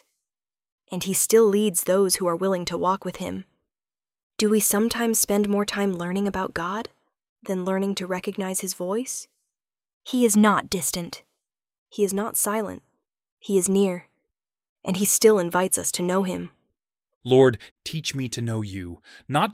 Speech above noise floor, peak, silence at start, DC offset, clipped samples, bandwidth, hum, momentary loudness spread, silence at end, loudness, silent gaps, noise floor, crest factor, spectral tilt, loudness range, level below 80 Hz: over 67 dB; -4 dBFS; 0.9 s; under 0.1%; under 0.1%; 16.5 kHz; none; 18 LU; 0 s; -23 LUFS; 4.23-4.30 s, 7.29-7.36 s, 9.93-10.01 s, 11.78-11.86 s, 13.32-13.37 s, 14.69-14.76 s, 17.15-17.21 s, 17.71-17.76 s; under -90 dBFS; 20 dB; -4 dB/octave; 5 LU; -58 dBFS